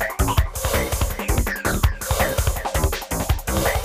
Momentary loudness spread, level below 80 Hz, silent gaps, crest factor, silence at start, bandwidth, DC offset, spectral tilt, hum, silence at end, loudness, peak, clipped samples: 3 LU; -26 dBFS; none; 18 dB; 0 s; 16 kHz; under 0.1%; -4 dB/octave; none; 0 s; -22 LUFS; -4 dBFS; under 0.1%